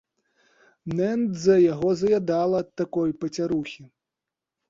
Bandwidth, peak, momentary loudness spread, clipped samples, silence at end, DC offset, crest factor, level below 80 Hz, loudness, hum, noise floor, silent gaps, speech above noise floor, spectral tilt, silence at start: 7.6 kHz; -8 dBFS; 12 LU; under 0.1%; 0.85 s; under 0.1%; 18 dB; -60 dBFS; -24 LUFS; none; -87 dBFS; none; 64 dB; -7 dB/octave; 0.85 s